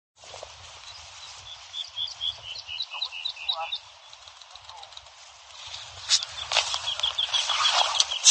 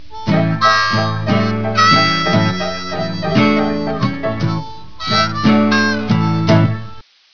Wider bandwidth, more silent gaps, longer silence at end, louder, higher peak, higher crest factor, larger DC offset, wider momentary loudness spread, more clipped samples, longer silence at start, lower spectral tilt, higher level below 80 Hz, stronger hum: first, 11 kHz vs 5.4 kHz; neither; about the same, 0 s vs 0 s; second, -25 LUFS vs -15 LUFS; about the same, 0 dBFS vs 0 dBFS; first, 30 dB vs 14 dB; second, under 0.1% vs 3%; first, 23 LU vs 9 LU; neither; about the same, 0.2 s vs 0.1 s; second, 3 dB/octave vs -5.5 dB/octave; second, -64 dBFS vs -44 dBFS; neither